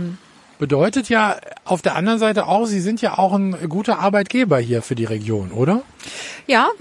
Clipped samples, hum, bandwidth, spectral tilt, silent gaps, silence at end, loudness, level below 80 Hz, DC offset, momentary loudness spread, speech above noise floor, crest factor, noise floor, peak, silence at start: under 0.1%; none; 11.5 kHz; -6 dB/octave; none; 0.05 s; -19 LUFS; -60 dBFS; under 0.1%; 11 LU; 20 dB; 16 dB; -38 dBFS; -2 dBFS; 0 s